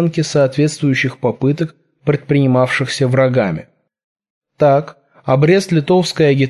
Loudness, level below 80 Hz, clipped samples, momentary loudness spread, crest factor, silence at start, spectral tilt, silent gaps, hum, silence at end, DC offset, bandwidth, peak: -15 LUFS; -54 dBFS; under 0.1%; 9 LU; 14 dB; 0 s; -6.5 dB/octave; 4.04-4.16 s, 4.30-4.41 s; none; 0 s; under 0.1%; 12 kHz; -2 dBFS